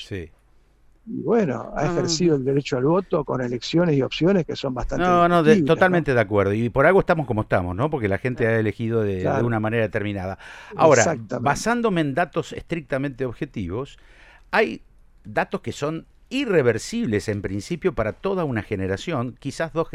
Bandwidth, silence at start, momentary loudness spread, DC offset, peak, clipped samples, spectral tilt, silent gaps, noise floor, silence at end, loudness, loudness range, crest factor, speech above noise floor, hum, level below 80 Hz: 13.5 kHz; 0 s; 12 LU; under 0.1%; -2 dBFS; under 0.1%; -6 dB/octave; none; -55 dBFS; 0.05 s; -22 LUFS; 7 LU; 20 dB; 34 dB; none; -44 dBFS